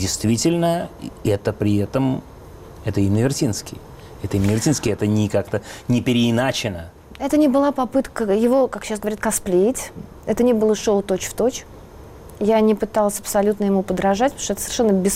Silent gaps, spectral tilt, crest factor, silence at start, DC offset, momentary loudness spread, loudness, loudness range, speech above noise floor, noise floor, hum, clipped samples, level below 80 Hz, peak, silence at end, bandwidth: none; -5.5 dB/octave; 12 dB; 0 s; under 0.1%; 11 LU; -20 LUFS; 3 LU; 21 dB; -40 dBFS; none; under 0.1%; -44 dBFS; -8 dBFS; 0 s; 16 kHz